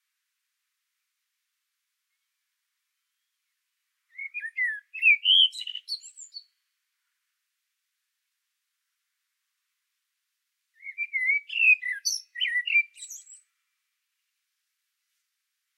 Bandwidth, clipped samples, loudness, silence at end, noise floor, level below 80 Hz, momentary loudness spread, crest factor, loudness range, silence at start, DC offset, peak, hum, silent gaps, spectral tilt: 14.5 kHz; under 0.1%; -23 LUFS; 2.4 s; -82 dBFS; under -90 dBFS; 23 LU; 22 dB; 14 LU; 4.2 s; under 0.1%; -10 dBFS; none; none; 12.5 dB/octave